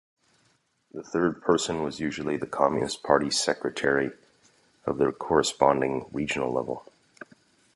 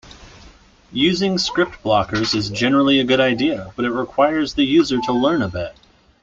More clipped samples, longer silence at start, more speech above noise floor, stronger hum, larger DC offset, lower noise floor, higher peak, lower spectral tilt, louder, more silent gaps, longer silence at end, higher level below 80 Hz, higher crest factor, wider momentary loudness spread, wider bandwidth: neither; first, 0.95 s vs 0.05 s; first, 42 dB vs 29 dB; neither; neither; first, -68 dBFS vs -47 dBFS; about the same, -4 dBFS vs -4 dBFS; about the same, -4 dB/octave vs -5 dB/octave; second, -26 LUFS vs -18 LUFS; neither; first, 0.95 s vs 0.5 s; second, -58 dBFS vs -46 dBFS; first, 24 dB vs 16 dB; about the same, 10 LU vs 8 LU; first, 11.5 kHz vs 7.8 kHz